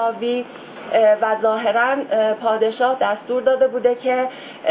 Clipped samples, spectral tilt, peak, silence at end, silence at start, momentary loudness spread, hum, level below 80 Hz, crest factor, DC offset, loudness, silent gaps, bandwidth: under 0.1%; -8 dB/octave; -4 dBFS; 0 s; 0 s; 9 LU; none; -70 dBFS; 14 dB; under 0.1%; -19 LUFS; none; 4 kHz